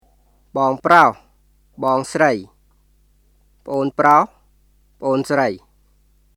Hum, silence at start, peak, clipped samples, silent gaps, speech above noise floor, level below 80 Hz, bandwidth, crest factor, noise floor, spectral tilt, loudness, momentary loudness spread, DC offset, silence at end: 50 Hz at -55 dBFS; 0.55 s; 0 dBFS; under 0.1%; none; 40 dB; -56 dBFS; 18.5 kHz; 20 dB; -57 dBFS; -5.5 dB/octave; -17 LUFS; 14 LU; under 0.1%; 0.8 s